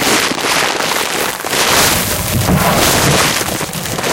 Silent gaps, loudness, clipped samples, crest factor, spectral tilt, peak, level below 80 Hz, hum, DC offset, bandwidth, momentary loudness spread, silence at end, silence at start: none; -12 LUFS; under 0.1%; 14 dB; -2.5 dB/octave; 0 dBFS; -32 dBFS; none; under 0.1%; 17.5 kHz; 7 LU; 0 s; 0 s